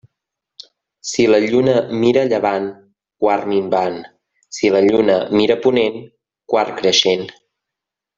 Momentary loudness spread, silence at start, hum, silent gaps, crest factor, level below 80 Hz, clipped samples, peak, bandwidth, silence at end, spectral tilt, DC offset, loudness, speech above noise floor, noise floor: 11 LU; 1.05 s; none; none; 16 dB; -58 dBFS; under 0.1%; 0 dBFS; 7.8 kHz; 0.85 s; -4.5 dB/octave; under 0.1%; -16 LUFS; 68 dB; -84 dBFS